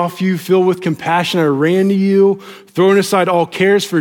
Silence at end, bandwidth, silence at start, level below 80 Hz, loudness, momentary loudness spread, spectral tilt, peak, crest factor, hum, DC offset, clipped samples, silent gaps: 0 s; 17.5 kHz; 0 s; -64 dBFS; -14 LUFS; 6 LU; -6 dB/octave; -2 dBFS; 12 dB; none; under 0.1%; under 0.1%; none